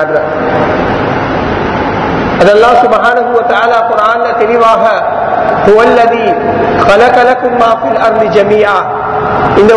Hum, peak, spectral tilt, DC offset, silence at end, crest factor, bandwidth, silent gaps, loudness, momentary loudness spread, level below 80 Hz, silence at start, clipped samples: none; 0 dBFS; -6 dB/octave; under 0.1%; 0 s; 8 dB; 11 kHz; none; -8 LUFS; 7 LU; -34 dBFS; 0 s; 4%